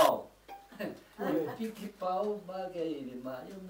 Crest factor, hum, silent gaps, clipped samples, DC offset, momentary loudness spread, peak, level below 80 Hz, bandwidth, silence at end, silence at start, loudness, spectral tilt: 24 dB; none; none; under 0.1%; under 0.1%; 9 LU; -10 dBFS; -70 dBFS; 16 kHz; 0 s; 0 s; -36 LUFS; -5 dB/octave